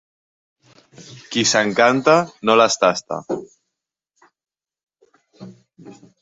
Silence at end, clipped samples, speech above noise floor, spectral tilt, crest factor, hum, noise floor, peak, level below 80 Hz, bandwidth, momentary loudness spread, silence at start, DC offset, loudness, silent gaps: 0.3 s; under 0.1%; over 72 dB; -3 dB/octave; 20 dB; none; under -90 dBFS; -2 dBFS; -66 dBFS; 8 kHz; 13 LU; 1 s; under 0.1%; -17 LUFS; 4.83-4.87 s